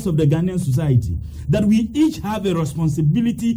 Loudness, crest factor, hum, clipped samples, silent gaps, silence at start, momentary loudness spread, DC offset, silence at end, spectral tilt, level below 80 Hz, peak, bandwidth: -19 LUFS; 12 dB; none; under 0.1%; none; 0 s; 5 LU; under 0.1%; 0 s; -7.5 dB/octave; -36 dBFS; -6 dBFS; 19.5 kHz